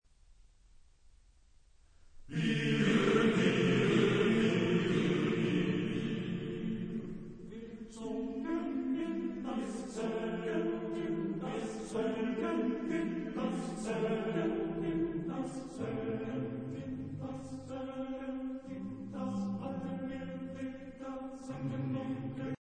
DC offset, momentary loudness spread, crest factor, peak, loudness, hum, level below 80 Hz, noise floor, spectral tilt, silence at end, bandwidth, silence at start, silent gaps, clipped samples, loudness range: under 0.1%; 14 LU; 18 dB; -16 dBFS; -35 LUFS; none; -60 dBFS; -63 dBFS; -6.5 dB/octave; 0.1 s; 9.8 kHz; 0.3 s; none; under 0.1%; 11 LU